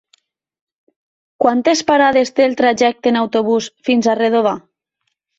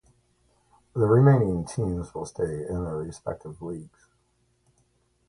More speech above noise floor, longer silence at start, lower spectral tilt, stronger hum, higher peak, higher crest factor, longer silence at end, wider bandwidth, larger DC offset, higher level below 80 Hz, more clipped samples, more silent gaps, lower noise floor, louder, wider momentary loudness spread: first, 58 dB vs 44 dB; first, 1.4 s vs 0.95 s; second, -4 dB/octave vs -8.5 dB/octave; second, none vs 60 Hz at -55 dBFS; first, 0 dBFS vs -8 dBFS; about the same, 16 dB vs 20 dB; second, 0.8 s vs 1.4 s; second, 8 kHz vs 11 kHz; neither; second, -60 dBFS vs -48 dBFS; neither; neither; first, -73 dBFS vs -69 dBFS; first, -15 LUFS vs -26 LUFS; second, 5 LU vs 18 LU